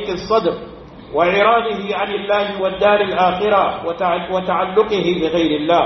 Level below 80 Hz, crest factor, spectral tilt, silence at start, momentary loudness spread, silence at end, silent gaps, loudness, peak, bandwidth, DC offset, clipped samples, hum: -46 dBFS; 16 dB; -6 dB/octave; 0 s; 7 LU; 0 s; none; -17 LUFS; -2 dBFS; 6.2 kHz; under 0.1%; under 0.1%; none